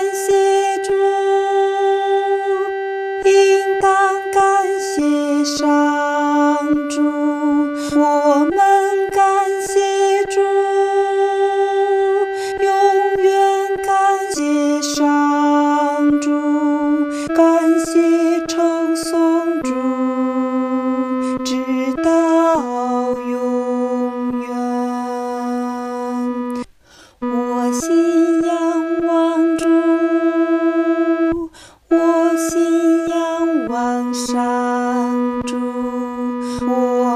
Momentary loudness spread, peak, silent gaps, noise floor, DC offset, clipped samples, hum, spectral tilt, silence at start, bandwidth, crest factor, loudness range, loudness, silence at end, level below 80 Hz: 8 LU; -2 dBFS; none; -47 dBFS; under 0.1%; under 0.1%; none; -3.5 dB/octave; 0 s; 15 kHz; 14 dB; 4 LU; -17 LUFS; 0 s; -54 dBFS